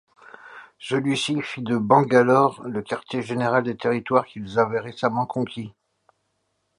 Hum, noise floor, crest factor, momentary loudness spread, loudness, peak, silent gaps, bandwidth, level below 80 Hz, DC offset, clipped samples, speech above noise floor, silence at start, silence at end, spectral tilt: none; -73 dBFS; 20 dB; 14 LU; -22 LUFS; -2 dBFS; none; 11.5 kHz; -64 dBFS; under 0.1%; under 0.1%; 51 dB; 0.45 s; 1.1 s; -6 dB/octave